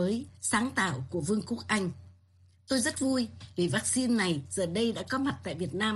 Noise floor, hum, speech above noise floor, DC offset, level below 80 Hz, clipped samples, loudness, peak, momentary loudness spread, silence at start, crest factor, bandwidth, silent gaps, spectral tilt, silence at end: -62 dBFS; none; 31 dB; under 0.1%; -62 dBFS; under 0.1%; -30 LUFS; -12 dBFS; 7 LU; 0 s; 18 dB; 12.5 kHz; none; -4 dB/octave; 0 s